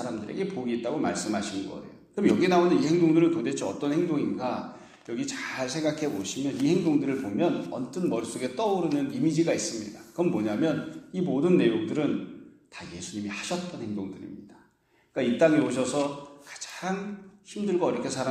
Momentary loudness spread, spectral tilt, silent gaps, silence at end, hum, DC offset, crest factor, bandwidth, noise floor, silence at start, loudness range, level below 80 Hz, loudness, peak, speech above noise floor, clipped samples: 17 LU; -5.5 dB/octave; none; 0 s; none; under 0.1%; 20 dB; 12.5 kHz; -66 dBFS; 0 s; 5 LU; -68 dBFS; -27 LUFS; -8 dBFS; 39 dB; under 0.1%